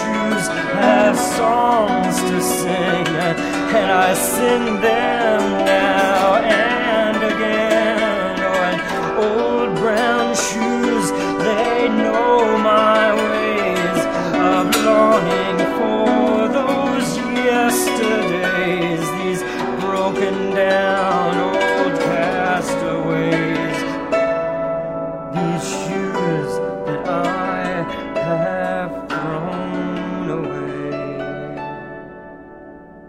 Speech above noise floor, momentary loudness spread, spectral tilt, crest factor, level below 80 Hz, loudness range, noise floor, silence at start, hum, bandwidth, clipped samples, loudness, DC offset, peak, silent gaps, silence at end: 23 dB; 9 LU; -4.5 dB/octave; 16 dB; -48 dBFS; 6 LU; -38 dBFS; 0 s; none; 16 kHz; under 0.1%; -18 LUFS; under 0.1%; 0 dBFS; none; 0 s